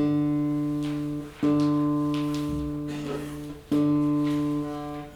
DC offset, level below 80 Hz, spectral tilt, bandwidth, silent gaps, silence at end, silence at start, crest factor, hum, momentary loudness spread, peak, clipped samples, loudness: under 0.1%; -48 dBFS; -7.5 dB/octave; 13.5 kHz; none; 0 s; 0 s; 12 dB; none; 10 LU; -14 dBFS; under 0.1%; -27 LUFS